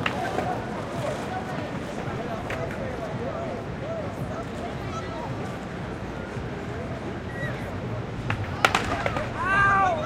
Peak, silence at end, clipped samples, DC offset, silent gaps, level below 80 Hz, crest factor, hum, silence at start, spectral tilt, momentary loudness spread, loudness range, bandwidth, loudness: -2 dBFS; 0 s; under 0.1%; under 0.1%; none; -44 dBFS; 28 dB; none; 0 s; -5.5 dB/octave; 11 LU; 6 LU; 16.5 kHz; -29 LUFS